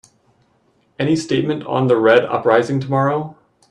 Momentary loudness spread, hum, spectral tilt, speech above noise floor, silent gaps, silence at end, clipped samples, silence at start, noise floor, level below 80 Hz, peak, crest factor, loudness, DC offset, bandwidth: 9 LU; none; -6.5 dB/octave; 44 dB; none; 0.4 s; under 0.1%; 1 s; -60 dBFS; -60 dBFS; 0 dBFS; 18 dB; -17 LUFS; under 0.1%; 10.5 kHz